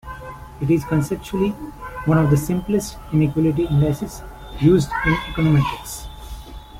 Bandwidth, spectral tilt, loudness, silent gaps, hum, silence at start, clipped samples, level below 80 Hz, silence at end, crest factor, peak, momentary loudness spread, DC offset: 16 kHz; -7 dB/octave; -20 LUFS; none; none; 0.05 s; under 0.1%; -36 dBFS; 0 s; 18 dB; -4 dBFS; 19 LU; under 0.1%